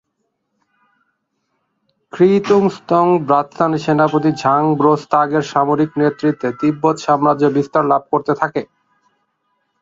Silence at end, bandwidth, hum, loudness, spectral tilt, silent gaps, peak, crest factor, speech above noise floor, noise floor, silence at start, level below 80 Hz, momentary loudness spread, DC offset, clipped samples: 1.2 s; 7.8 kHz; none; -15 LUFS; -7 dB/octave; none; 0 dBFS; 16 dB; 56 dB; -71 dBFS; 2.15 s; -60 dBFS; 5 LU; under 0.1%; under 0.1%